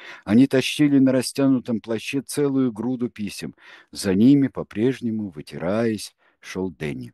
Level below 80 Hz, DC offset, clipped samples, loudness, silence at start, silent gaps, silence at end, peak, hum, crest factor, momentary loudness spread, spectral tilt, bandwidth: -60 dBFS; under 0.1%; under 0.1%; -22 LUFS; 0 s; none; 0.05 s; -6 dBFS; none; 16 dB; 14 LU; -6 dB/octave; 12.5 kHz